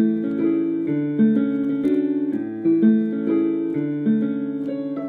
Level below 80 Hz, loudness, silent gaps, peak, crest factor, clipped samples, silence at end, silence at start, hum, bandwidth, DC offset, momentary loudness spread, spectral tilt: -68 dBFS; -21 LUFS; none; -6 dBFS; 14 dB; under 0.1%; 0 s; 0 s; none; 4.1 kHz; under 0.1%; 7 LU; -10.5 dB/octave